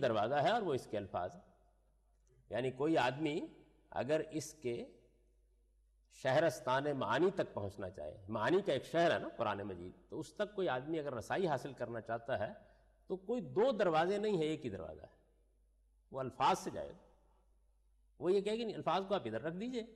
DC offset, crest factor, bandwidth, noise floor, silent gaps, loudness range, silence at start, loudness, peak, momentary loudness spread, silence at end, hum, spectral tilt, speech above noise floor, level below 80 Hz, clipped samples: under 0.1%; 14 dB; 13 kHz; -72 dBFS; none; 4 LU; 0 s; -37 LUFS; -24 dBFS; 13 LU; 0 s; none; -5.5 dB/octave; 35 dB; -70 dBFS; under 0.1%